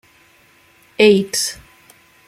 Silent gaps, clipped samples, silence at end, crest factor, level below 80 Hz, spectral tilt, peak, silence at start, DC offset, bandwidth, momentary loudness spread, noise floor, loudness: none; under 0.1%; 0.75 s; 18 dB; -58 dBFS; -3.5 dB/octave; -2 dBFS; 1 s; under 0.1%; 15.5 kHz; 25 LU; -52 dBFS; -15 LUFS